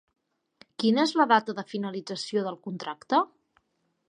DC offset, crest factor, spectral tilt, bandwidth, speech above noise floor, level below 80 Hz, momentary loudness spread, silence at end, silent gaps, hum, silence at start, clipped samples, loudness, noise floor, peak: under 0.1%; 20 dB; -5 dB/octave; 10.5 kHz; 49 dB; -82 dBFS; 14 LU; 0.85 s; none; none; 0.8 s; under 0.1%; -27 LUFS; -75 dBFS; -8 dBFS